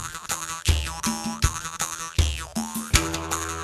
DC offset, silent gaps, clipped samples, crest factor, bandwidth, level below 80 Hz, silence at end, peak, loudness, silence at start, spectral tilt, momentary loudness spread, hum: under 0.1%; none; under 0.1%; 26 dB; 14 kHz; -30 dBFS; 0 s; -2 dBFS; -26 LUFS; 0 s; -3 dB/octave; 7 LU; none